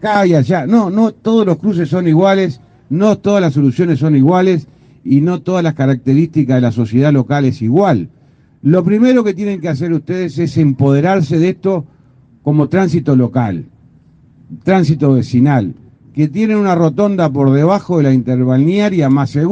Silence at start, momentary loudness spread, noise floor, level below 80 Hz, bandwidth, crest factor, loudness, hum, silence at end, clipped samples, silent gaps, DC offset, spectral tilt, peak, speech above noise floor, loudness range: 0 s; 7 LU; -46 dBFS; -52 dBFS; 7.8 kHz; 12 dB; -13 LUFS; none; 0 s; under 0.1%; none; under 0.1%; -8.5 dB/octave; 0 dBFS; 35 dB; 3 LU